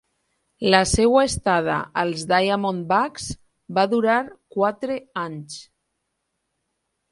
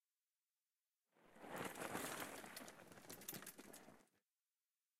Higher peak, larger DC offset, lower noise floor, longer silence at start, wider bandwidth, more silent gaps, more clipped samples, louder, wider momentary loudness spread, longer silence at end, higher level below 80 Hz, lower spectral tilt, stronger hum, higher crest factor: first, 0 dBFS vs -32 dBFS; neither; second, -76 dBFS vs under -90 dBFS; second, 0.6 s vs 1.15 s; second, 11.5 kHz vs 16 kHz; neither; neither; first, -21 LUFS vs -52 LUFS; about the same, 15 LU vs 14 LU; first, 1.5 s vs 0.8 s; first, -44 dBFS vs -86 dBFS; first, -4 dB/octave vs -2.5 dB/octave; neither; about the same, 22 dB vs 24 dB